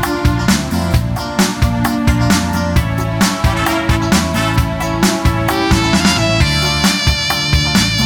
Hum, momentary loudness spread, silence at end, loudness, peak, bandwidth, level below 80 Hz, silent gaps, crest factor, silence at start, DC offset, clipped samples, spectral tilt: none; 4 LU; 0 s; -14 LUFS; 0 dBFS; 19.5 kHz; -22 dBFS; none; 14 dB; 0 s; 0.2%; under 0.1%; -4.5 dB/octave